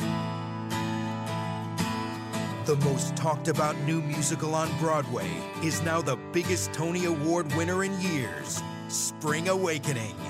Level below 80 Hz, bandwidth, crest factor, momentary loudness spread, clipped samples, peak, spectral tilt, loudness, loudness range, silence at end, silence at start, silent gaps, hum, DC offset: -62 dBFS; 16 kHz; 14 dB; 6 LU; under 0.1%; -14 dBFS; -4.5 dB/octave; -29 LUFS; 1 LU; 0 s; 0 s; none; none; under 0.1%